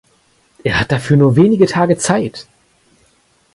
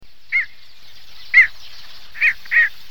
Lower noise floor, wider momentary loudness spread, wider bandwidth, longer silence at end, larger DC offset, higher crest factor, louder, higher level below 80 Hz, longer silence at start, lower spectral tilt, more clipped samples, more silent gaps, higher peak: first, -56 dBFS vs -46 dBFS; first, 13 LU vs 9 LU; second, 11.5 kHz vs 19 kHz; first, 1.15 s vs 0.2 s; second, under 0.1% vs 3%; about the same, 14 dB vs 18 dB; about the same, -13 LUFS vs -15 LUFS; first, -42 dBFS vs -54 dBFS; first, 0.65 s vs 0 s; first, -6 dB/octave vs 0 dB/octave; neither; neither; about the same, 0 dBFS vs -2 dBFS